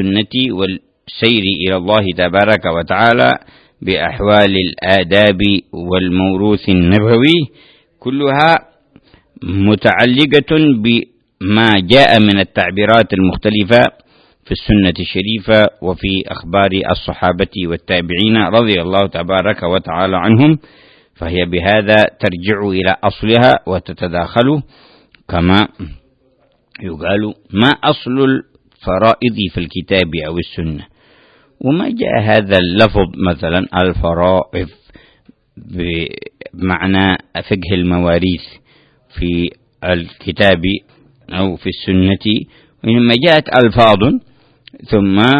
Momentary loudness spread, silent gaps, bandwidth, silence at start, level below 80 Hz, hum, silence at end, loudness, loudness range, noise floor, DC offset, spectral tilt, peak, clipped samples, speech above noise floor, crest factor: 12 LU; none; 11 kHz; 0 s; -36 dBFS; none; 0 s; -13 LUFS; 6 LU; -55 dBFS; under 0.1%; -7.5 dB/octave; 0 dBFS; 0.1%; 43 dB; 14 dB